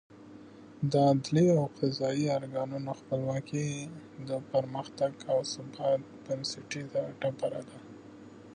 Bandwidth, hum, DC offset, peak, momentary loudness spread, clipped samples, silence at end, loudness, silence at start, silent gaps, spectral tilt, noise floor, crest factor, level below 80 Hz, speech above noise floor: 10 kHz; none; under 0.1%; -14 dBFS; 24 LU; under 0.1%; 0 s; -31 LUFS; 0.1 s; none; -6.5 dB/octave; -51 dBFS; 18 dB; -70 dBFS; 20 dB